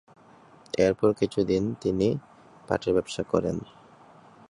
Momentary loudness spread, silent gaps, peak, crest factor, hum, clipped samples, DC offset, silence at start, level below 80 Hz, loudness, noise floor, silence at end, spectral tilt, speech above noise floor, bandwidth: 9 LU; none; -6 dBFS; 20 dB; none; under 0.1%; under 0.1%; 0.75 s; -54 dBFS; -27 LUFS; -54 dBFS; 0.85 s; -6.5 dB/octave; 29 dB; 11 kHz